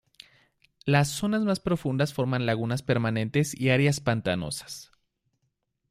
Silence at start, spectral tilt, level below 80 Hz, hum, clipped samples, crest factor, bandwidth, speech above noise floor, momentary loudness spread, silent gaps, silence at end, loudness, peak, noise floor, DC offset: 0.85 s; -5.5 dB/octave; -58 dBFS; none; under 0.1%; 20 dB; 15.5 kHz; 51 dB; 10 LU; none; 1.05 s; -26 LUFS; -8 dBFS; -77 dBFS; under 0.1%